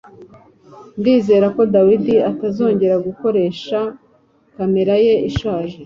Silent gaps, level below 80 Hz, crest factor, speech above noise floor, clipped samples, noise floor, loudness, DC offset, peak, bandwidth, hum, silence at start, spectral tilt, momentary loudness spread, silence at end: none; -44 dBFS; 14 dB; 40 dB; under 0.1%; -55 dBFS; -16 LUFS; under 0.1%; -2 dBFS; 7.2 kHz; none; 0.2 s; -8 dB/octave; 9 LU; 0 s